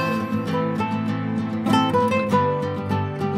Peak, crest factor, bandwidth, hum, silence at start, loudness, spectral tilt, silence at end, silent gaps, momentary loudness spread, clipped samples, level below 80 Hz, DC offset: -6 dBFS; 16 dB; 15.5 kHz; none; 0 s; -22 LUFS; -7 dB/octave; 0 s; none; 6 LU; under 0.1%; -58 dBFS; under 0.1%